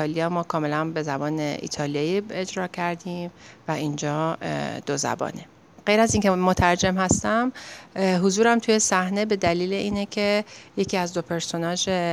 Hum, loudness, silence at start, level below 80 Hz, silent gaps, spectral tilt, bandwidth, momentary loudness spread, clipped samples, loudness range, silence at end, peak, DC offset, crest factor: none; -24 LUFS; 0 s; -48 dBFS; none; -4.5 dB/octave; 14 kHz; 10 LU; under 0.1%; 7 LU; 0 s; -4 dBFS; under 0.1%; 20 dB